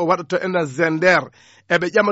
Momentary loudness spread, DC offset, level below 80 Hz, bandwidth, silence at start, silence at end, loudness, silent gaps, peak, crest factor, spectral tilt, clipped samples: 6 LU; under 0.1%; -60 dBFS; 8 kHz; 0 s; 0 s; -18 LUFS; none; -2 dBFS; 16 dB; -3.5 dB/octave; under 0.1%